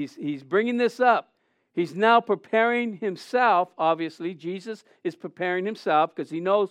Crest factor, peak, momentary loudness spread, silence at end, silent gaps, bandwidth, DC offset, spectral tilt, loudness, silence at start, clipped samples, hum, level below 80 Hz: 18 dB; -6 dBFS; 13 LU; 0 s; none; 11.5 kHz; under 0.1%; -6 dB/octave; -24 LUFS; 0 s; under 0.1%; none; under -90 dBFS